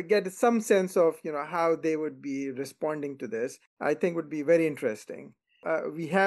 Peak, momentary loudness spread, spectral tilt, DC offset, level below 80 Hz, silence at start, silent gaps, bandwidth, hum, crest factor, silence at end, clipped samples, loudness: -10 dBFS; 10 LU; -5.5 dB/octave; under 0.1%; -82 dBFS; 0 s; 3.67-3.77 s; 12.5 kHz; none; 18 dB; 0 s; under 0.1%; -28 LUFS